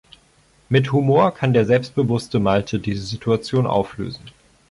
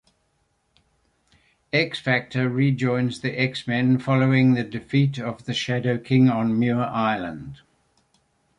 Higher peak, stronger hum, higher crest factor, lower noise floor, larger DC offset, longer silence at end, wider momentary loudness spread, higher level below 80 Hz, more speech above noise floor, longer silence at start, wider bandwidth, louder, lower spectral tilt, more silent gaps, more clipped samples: about the same, -4 dBFS vs -6 dBFS; neither; about the same, 16 dB vs 18 dB; second, -56 dBFS vs -69 dBFS; neither; second, 0.4 s vs 1.05 s; about the same, 10 LU vs 8 LU; first, -48 dBFS vs -60 dBFS; second, 37 dB vs 47 dB; second, 0.7 s vs 1.75 s; about the same, 11.5 kHz vs 10.5 kHz; first, -19 LUFS vs -22 LUFS; about the same, -7 dB/octave vs -7 dB/octave; neither; neither